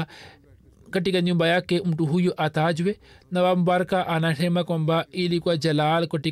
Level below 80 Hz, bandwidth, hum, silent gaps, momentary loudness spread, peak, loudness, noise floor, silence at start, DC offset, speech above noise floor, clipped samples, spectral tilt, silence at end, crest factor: -60 dBFS; 13 kHz; none; none; 6 LU; -12 dBFS; -23 LUFS; -53 dBFS; 0 s; under 0.1%; 30 dB; under 0.1%; -6.5 dB/octave; 0 s; 10 dB